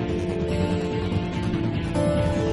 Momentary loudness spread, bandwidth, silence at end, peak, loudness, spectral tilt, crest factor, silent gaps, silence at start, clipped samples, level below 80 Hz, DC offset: 4 LU; 11.5 kHz; 0 s; -10 dBFS; -25 LUFS; -7.5 dB/octave; 14 dB; none; 0 s; under 0.1%; -38 dBFS; under 0.1%